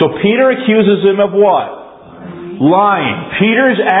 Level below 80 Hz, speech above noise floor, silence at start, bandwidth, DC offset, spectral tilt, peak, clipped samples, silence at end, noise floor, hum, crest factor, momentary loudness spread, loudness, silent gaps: -52 dBFS; 21 dB; 0 s; 4 kHz; under 0.1%; -10 dB/octave; 0 dBFS; under 0.1%; 0 s; -32 dBFS; none; 12 dB; 17 LU; -11 LUFS; none